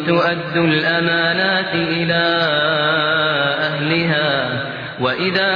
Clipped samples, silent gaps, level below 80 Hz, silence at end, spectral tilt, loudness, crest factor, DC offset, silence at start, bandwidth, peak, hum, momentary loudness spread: under 0.1%; none; -56 dBFS; 0 s; -7 dB/octave; -16 LUFS; 14 dB; under 0.1%; 0 s; 5.2 kHz; -2 dBFS; none; 4 LU